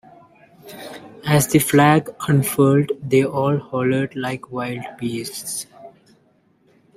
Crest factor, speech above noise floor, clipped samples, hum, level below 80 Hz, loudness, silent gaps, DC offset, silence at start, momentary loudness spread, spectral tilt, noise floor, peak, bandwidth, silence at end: 18 dB; 40 dB; under 0.1%; none; -54 dBFS; -19 LUFS; none; under 0.1%; 0.65 s; 20 LU; -5.5 dB/octave; -59 dBFS; -2 dBFS; 16 kHz; 1.1 s